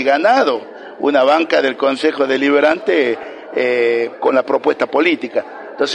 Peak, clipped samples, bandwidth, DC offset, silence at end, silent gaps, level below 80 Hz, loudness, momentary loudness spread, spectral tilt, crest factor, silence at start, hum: 0 dBFS; under 0.1%; 10.5 kHz; under 0.1%; 0 s; none; -64 dBFS; -15 LUFS; 10 LU; -4 dB/octave; 14 dB; 0 s; none